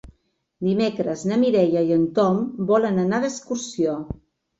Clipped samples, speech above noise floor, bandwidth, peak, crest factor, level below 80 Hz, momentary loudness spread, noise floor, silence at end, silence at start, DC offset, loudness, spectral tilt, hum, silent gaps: under 0.1%; 45 dB; 8 kHz; -6 dBFS; 16 dB; -54 dBFS; 10 LU; -66 dBFS; 0.45 s; 0.6 s; under 0.1%; -22 LUFS; -6.5 dB/octave; none; none